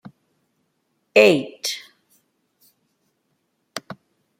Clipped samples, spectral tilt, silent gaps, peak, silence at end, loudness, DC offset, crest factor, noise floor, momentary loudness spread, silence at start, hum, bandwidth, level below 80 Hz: under 0.1%; -3.5 dB/octave; none; -2 dBFS; 0.45 s; -18 LUFS; under 0.1%; 22 dB; -71 dBFS; 25 LU; 1.15 s; none; 16.5 kHz; -70 dBFS